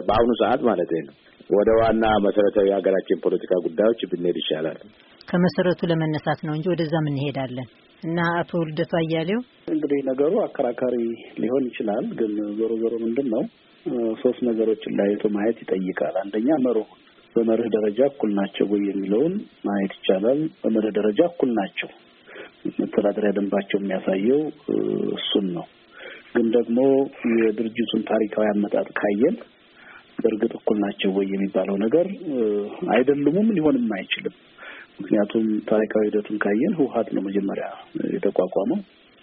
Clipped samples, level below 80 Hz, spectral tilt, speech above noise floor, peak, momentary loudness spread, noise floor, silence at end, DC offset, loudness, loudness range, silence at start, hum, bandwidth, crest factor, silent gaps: under 0.1%; -54 dBFS; -5.5 dB/octave; 26 dB; -6 dBFS; 9 LU; -48 dBFS; 0.4 s; under 0.1%; -23 LUFS; 3 LU; 0 s; none; 5 kHz; 18 dB; none